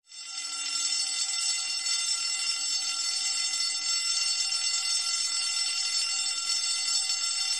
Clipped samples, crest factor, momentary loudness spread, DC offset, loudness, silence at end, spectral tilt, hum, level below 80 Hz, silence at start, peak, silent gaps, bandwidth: under 0.1%; 16 dB; 2 LU; 0.1%; -26 LUFS; 0 s; 5 dB/octave; none; -78 dBFS; 0.1 s; -14 dBFS; none; 11.5 kHz